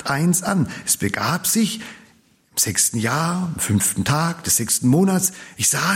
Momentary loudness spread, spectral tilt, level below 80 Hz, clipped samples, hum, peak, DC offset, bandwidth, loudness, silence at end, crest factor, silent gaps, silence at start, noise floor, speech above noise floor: 6 LU; -3.5 dB/octave; -54 dBFS; under 0.1%; none; -4 dBFS; under 0.1%; 16.5 kHz; -19 LUFS; 0 s; 16 dB; none; 0 s; -56 dBFS; 36 dB